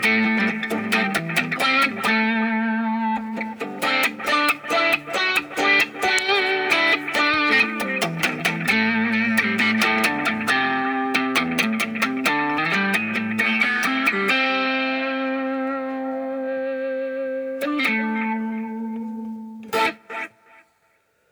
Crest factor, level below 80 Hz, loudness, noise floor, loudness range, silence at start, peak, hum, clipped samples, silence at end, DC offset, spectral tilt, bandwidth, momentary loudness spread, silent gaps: 22 dB; -64 dBFS; -20 LUFS; -64 dBFS; 6 LU; 0 s; 0 dBFS; none; under 0.1%; 1.05 s; under 0.1%; -3.5 dB/octave; over 20 kHz; 10 LU; none